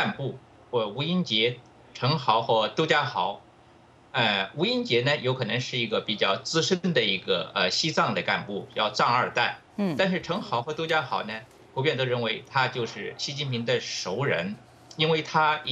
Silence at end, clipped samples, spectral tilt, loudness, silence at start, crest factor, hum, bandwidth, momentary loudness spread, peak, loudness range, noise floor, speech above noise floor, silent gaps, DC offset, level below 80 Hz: 0 s; under 0.1%; -4.5 dB/octave; -26 LUFS; 0 s; 20 dB; none; 9.2 kHz; 9 LU; -6 dBFS; 3 LU; -55 dBFS; 29 dB; none; under 0.1%; -68 dBFS